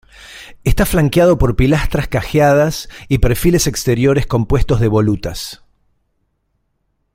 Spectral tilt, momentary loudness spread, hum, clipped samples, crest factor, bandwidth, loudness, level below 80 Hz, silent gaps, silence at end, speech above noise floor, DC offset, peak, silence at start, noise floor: -6 dB/octave; 14 LU; none; under 0.1%; 14 dB; 16.5 kHz; -15 LUFS; -24 dBFS; none; 1.6 s; 53 dB; under 0.1%; -2 dBFS; 0.2 s; -66 dBFS